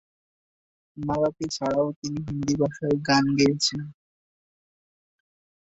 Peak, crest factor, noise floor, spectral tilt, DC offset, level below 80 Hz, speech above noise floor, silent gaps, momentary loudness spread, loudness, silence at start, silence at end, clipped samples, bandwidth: -8 dBFS; 18 dB; under -90 dBFS; -5 dB/octave; under 0.1%; -56 dBFS; over 66 dB; 1.96-2.02 s; 11 LU; -25 LUFS; 0.95 s; 1.7 s; under 0.1%; 8 kHz